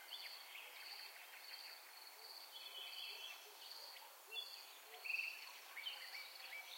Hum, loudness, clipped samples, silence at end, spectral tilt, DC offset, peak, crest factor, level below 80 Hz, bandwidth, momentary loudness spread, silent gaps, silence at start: none; -50 LUFS; under 0.1%; 0 s; 5 dB/octave; under 0.1%; -32 dBFS; 20 dB; under -90 dBFS; 16.5 kHz; 10 LU; none; 0 s